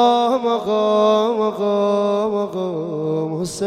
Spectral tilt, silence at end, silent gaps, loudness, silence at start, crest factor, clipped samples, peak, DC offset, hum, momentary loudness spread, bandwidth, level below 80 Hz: -6 dB/octave; 0 s; none; -19 LUFS; 0 s; 14 dB; under 0.1%; -4 dBFS; under 0.1%; none; 8 LU; 13.5 kHz; -60 dBFS